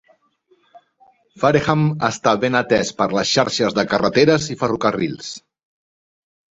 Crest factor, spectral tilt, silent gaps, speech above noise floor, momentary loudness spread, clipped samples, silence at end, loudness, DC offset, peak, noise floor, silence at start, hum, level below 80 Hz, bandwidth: 18 dB; -5 dB/octave; none; 42 dB; 8 LU; under 0.1%; 1.15 s; -18 LUFS; under 0.1%; -2 dBFS; -60 dBFS; 0.75 s; none; -52 dBFS; 8 kHz